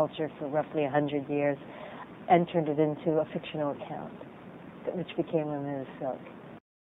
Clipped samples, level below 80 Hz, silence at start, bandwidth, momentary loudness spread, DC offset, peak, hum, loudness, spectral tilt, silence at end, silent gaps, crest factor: under 0.1%; -70 dBFS; 0 s; 4 kHz; 19 LU; under 0.1%; -8 dBFS; none; -31 LUFS; -10 dB/octave; 0.4 s; none; 22 dB